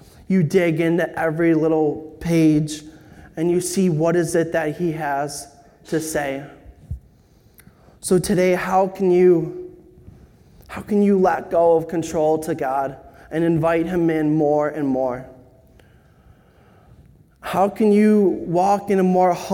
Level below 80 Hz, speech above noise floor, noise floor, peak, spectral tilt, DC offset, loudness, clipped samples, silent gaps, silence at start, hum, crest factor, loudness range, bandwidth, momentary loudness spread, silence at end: -50 dBFS; 35 dB; -53 dBFS; -4 dBFS; -6.5 dB/octave; under 0.1%; -19 LUFS; under 0.1%; none; 0.3 s; none; 16 dB; 6 LU; 17 kHz; 14 LU; 0 s